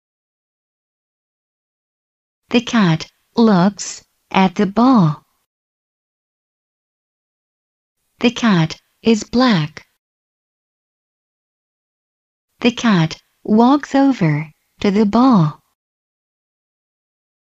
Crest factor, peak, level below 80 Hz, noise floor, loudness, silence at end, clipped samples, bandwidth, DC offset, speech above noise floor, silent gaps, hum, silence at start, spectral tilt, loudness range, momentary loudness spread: 18 dB; 0 dBFS; -54 dBFS; under -90 dBFS; -15 LUFS; 2 s; under 0.1%; 8.2 kHz; under 0.1%; over 76 dB; 5.46-7.96 s, 9.99-12.48 s; none; 2.5 s; -6 dB/octave; 7 LU; 11 LU